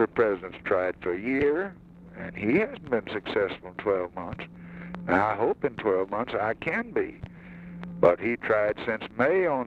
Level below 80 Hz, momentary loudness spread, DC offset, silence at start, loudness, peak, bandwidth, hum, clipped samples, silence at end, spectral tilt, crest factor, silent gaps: -56 dBFS; 16 LU; under 0.1%; 0 s; -27 LUFS; -8 dBFS; 7 kHz; none; under 0.1%; 0 s; -8 dB/octave; 20 dB; none